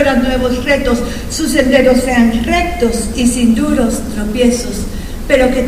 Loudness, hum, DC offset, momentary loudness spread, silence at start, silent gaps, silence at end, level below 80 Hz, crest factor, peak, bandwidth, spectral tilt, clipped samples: -13 LUFS; none; under 0.1%; 9 LU; 0 s; none; 0 s; -24 dBFS; 12 dB; 0 dBFS; 15.5 kHz; -4.5 dB/octave; under 0.1%